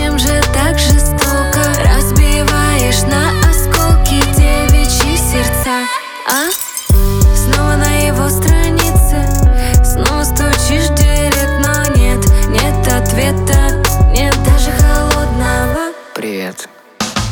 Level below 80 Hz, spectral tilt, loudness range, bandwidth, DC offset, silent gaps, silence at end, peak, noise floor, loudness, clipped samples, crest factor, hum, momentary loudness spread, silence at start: -14 dBFS; -4.5 dB/octave; 2 LU; over 20 kHz; under 0.1%; none; 0 s; 0 dBFS; -32 dBFS; -12 LUFS; under 0.1%; 10 dB; none; 5 LU; 0 s